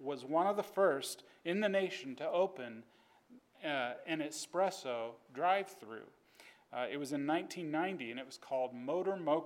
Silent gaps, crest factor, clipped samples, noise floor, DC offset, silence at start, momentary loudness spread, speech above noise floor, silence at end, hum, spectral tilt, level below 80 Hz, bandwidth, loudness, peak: none; 20 dB; under 0.1%; -64 dBFS; under 0.1%; 0 s; 13 LU; 27 dB; 0 s; none; -4.5 dB/octave; under -90 dBFS; 16.5 kHz; -37 LUFS; -18 dBFS